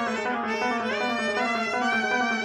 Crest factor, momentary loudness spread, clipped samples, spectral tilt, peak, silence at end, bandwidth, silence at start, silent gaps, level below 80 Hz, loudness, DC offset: 14 dB; 3 LU; under 0.1%; -3 dB/octave; -12 dBFS; 0 s; 12.5 kHz; 0 s; none; -68 dBFS; -25 LUFS; under 0.1%